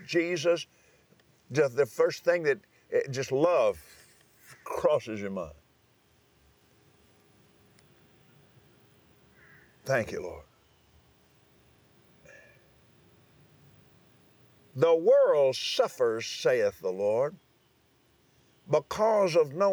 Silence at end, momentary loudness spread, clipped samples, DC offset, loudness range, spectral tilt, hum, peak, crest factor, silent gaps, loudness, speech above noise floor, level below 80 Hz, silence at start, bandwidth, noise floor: 0 s; 15 LU; under 0.1%; under 0.1%; 12 LU; -4.5 dB/octave; none; -12 dBFS; 18 dB; none; -27 LUFS; 39 dB; -68 dBFS; 0 s; over 20 kHz; -66 dBFS